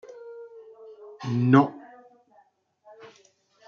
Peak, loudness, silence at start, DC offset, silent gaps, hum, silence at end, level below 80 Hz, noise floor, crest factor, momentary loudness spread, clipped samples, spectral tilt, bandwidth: -4 dBFS; -23 LUFS; 0.15 s; under 0.1%; none; none; 1.9 s; -76 dBFS; -63 dBFS; 24 dB; 27 LU; under 0.1%; -8.5 dB/octave; 6.8 kHz